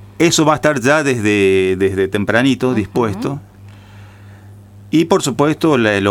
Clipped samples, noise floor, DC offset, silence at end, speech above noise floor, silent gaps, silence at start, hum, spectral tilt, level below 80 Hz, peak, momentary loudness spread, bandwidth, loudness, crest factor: under 0.1%; -38 dBFS; under 0.1%; 0 s; 24 dB; none; 0 s; none; -5 dB/octave; -50 dBFS; 0 dBFS; 6 LU; 16.5 kHz; -14 LUFS; 14 dB